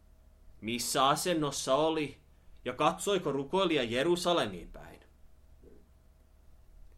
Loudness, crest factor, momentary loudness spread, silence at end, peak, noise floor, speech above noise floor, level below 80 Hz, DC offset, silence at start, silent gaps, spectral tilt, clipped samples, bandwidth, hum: -30 LUFS; 20 dB; 15 LU; 0.45 s; -12 dBFS; -60 dBFS; 30 dB; -58 dBFS; under 0.1%; 0.45 s; none; -3.5 dB/octave; under 0.1%; 16.5 kHz; none